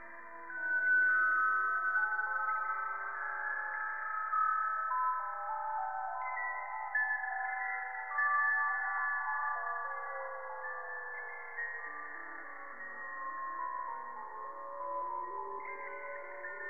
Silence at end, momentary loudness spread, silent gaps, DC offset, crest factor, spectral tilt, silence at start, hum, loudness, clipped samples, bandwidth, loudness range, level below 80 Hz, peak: 0 s; 14 LU; none; 0.2%; 14 dB; -5.5 dB/octave; 0 s; none; -35 LUFS; under 0.1%; 2.6 kHz; 10 LU; -86 dBFS; -22 dBFS